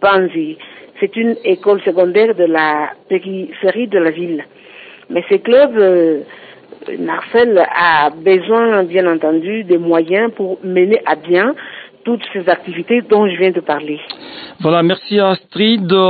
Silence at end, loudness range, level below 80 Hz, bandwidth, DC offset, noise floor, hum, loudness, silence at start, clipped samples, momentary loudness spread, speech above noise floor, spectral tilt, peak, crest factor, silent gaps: 0 s; 3 LU; -62 dBFS; 4.8 kHz; under 0.1%; -38 dBFS; none; -14 LUFS; 0 s; under 0.1%; 13 LU; 25 dB; -11 dB/octave; 0 dBFS; 14 dB; none